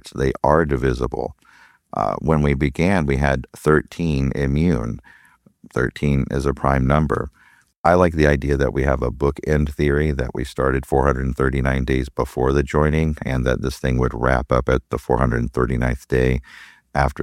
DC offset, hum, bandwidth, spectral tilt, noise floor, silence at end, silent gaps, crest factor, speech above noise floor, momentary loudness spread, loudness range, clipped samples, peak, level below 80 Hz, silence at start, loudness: under 0.1%; none; 14 kHz; -7.5 dB/octave; -52 dBFS; 0 s; 7.76-7.84 s; 18 dB; 33 dB; 7 LU; 2 LU; under 0.1%; -2 dBFS; -28 dBFS; 0.05 s; -20 LUFS